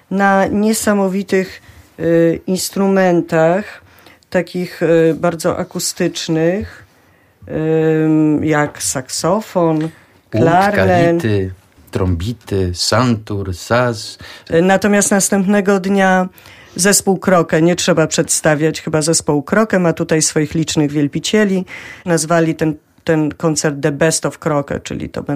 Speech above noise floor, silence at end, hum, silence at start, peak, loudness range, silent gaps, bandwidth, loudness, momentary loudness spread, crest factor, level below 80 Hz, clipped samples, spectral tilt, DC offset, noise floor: 36 dB; 0 s; none; 0.1 s; 0 dBFS; 4 LU; none; 15.5 kHz; -15 LUFS; 10 LU; 16 dB; -44 dBFS; under 0.1%; -4.5 dB/octave; under 0.1%; -51 dBFS